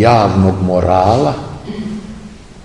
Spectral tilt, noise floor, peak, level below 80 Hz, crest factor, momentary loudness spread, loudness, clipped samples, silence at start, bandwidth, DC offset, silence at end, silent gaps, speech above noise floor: -7.5 dB/octave; -33 dBFS; 0 dBFS; -38 dBFS; 14 dB; 17 LU; -13 LUFS; under 0.1%; 0 s; 10.5 kHz; 0.5%; 0 s; none; 22 dB